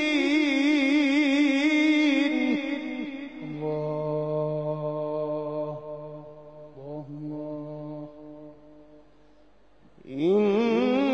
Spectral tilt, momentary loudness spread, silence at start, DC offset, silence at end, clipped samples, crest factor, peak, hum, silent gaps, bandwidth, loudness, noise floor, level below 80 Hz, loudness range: -6 dB/octave; 20 LU; 0 s; 0.2%; 0 s; under 0.1%; 14 dB; -12 dBFS; none; none; 8.6 kHz; -25 LUFS; -60 dBFS; -66 dBFS; 17 LU